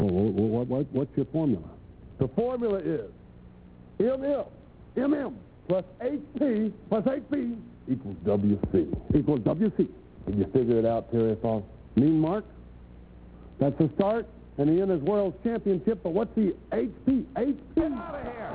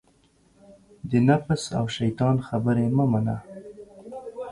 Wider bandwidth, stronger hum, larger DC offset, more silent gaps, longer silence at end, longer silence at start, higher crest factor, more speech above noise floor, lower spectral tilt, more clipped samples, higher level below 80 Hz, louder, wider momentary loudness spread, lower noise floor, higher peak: second, 4 kHz vs 11.5 kHz; neither; neither; neither; about the same, 0 s vs 0 s; second, 0 s vs 1.05 s; about the same, 18 dB vs 18 dB; second, 23 dB vs 39 dB; first, -12.5 dB/octave vs -7 dB/octave; neither; first, -48 dBFS vs -54 dBFS; second, -28 LUFS vs -24 LUFS; second, 9 LU vs 21 LU; second, -50 dBFS vs -61 dBFS; second, -10 dBFS vs -6 dBFS